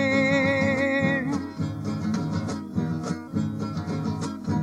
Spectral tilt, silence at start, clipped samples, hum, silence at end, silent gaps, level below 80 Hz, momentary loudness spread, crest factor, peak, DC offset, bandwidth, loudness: -6.5 dB/octave; 0 s; under 0.1%; none; 0 s; none; -56 dBFS; 9 LU; 16 dB; -10 dBFS; under 0.1%; 12 kHz; -26 LUFS